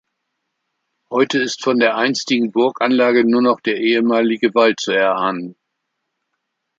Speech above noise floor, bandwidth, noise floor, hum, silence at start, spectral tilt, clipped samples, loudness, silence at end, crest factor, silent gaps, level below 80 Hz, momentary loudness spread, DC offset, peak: 59 dB; 7.8 kHz; -75 dBFS; none; 1.1 s; -4 dB/octave; under 0.1%; -16 LUFS; 1.25 s; 18 dB; none; -70 dBFS; 6 LU; under 0.1%; 0 dBFS